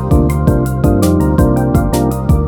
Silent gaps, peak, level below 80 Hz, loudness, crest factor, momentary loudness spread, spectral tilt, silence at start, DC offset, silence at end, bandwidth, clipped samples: none; 0 dBFS; -18 dBFS; -13 LUFS; 12 dB; 2 LU; -8 dB/octave; 0 s; under 0.1%; 0 s; 19 kHz; under 0.1%